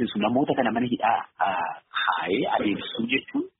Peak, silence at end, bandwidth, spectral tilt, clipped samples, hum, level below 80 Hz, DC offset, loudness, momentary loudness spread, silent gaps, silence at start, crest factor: -8 dBFS; 0.1 s; 4.1 kHz; -3 dB/octave; under 0.1%; none; -64 dBFS; under 0.1%; -25 LUFS; 4 LU; none; 0 s; 16 dB